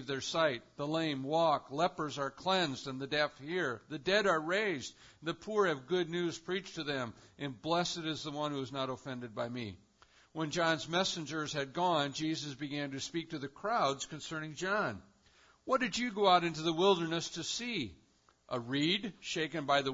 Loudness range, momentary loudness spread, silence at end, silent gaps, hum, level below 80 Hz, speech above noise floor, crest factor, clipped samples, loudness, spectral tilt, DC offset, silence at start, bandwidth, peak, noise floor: 5 LU; 11 LU; 0 s; none; none; -70 dBFS; 31 dB; 22 dB; under 0.1%; -34 LUFS; -3 dB/octave; under 0.1%; 0 s; 7.4 kHz; -14 dBFS; -66 dBFS